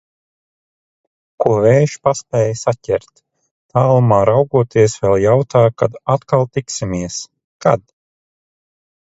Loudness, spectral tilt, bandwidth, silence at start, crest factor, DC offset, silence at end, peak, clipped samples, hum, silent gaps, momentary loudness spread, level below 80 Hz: -15 LUFS; -6.5 dB/octave; 8 kHz; 1.4 s; 16 dB; under 0.1%; 1.4 s; 0 dBFS; under 0.1%; none; 3.51-3.69 s, 7.44-7.60 s; 10 LU; -46 dBFS